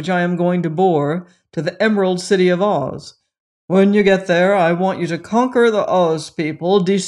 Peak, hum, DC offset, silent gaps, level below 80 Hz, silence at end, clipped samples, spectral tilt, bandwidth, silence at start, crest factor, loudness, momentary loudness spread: -2 dBFS; none; under 0.1%; 3.40-3.68 s; -60 dBFS; 0 s; under 0.1%; -6 dB/octave; 11 kHz; 0 s; 14 dB; -16 LUFS; 10 LU